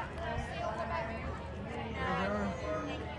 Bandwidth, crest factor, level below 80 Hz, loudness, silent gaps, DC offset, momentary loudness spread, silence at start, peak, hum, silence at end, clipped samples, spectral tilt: 11 kHz; 16 dB; -48 dBFS; -37 LUFS; none; under 0.1%; 7 LU; 0 s; -22 dBFS; none; 0 s; under 0.1%; -6.5 dB/octave